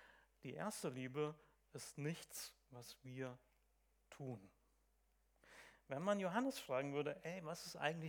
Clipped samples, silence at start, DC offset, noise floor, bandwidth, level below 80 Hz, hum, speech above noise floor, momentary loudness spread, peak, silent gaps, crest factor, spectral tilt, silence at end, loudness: under 0.1%; 0 s; under 0.1%; -79 dBFS; 19.5 kHz; -80 dBFS; none; 33 dB; 20 LU; -24 dBFS; none; 24 dB; -5 dB/octave; 0 s; -47 LUFS